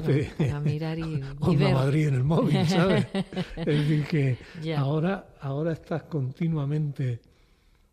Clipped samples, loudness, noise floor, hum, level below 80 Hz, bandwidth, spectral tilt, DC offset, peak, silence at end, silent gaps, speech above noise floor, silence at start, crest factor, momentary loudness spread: under 0.1%; -26 LUFS; -61 dBFS; none; -50 dBFS; 10.5 kHz; -7.5 dB/octave; under 0.1%; -12 dBFS; 0.75 s; none; 35 dB; 0 s; 14 dB; 10 LU